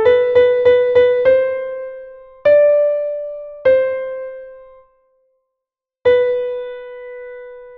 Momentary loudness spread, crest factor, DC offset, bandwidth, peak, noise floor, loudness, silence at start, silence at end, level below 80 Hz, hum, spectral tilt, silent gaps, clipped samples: 20 LU; 14 dB; under 0.1%; 4.5 kHz; -2 dBFS; -84 dBFS; -15 LUFS; 0 s; 0 s; -54 dBFS; none; -6 dB/octave; none; under 0.1%